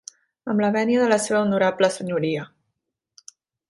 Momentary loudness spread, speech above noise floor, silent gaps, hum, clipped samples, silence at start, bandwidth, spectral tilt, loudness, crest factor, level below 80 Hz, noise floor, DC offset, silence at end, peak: 10 LU; 59 dB; none; none; under 0.1%; 0.45 s; 11.5 kHz; -5 dB/octave; -21 LUFS; 18 dB; -66 dBFS; -79 dBFS; under 0.1%; 1.25 s; -6 dBFS